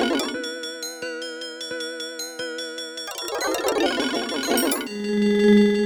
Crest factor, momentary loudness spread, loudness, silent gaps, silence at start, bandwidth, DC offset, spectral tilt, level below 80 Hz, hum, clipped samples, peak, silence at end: 18 dB; 12 LU; -24 LUFS; none; 0 s; over 20 kHz; under 0.1%; -4 dB/octave; -58 dBFS; none; under 0.1%; -6 dBFS; 0 s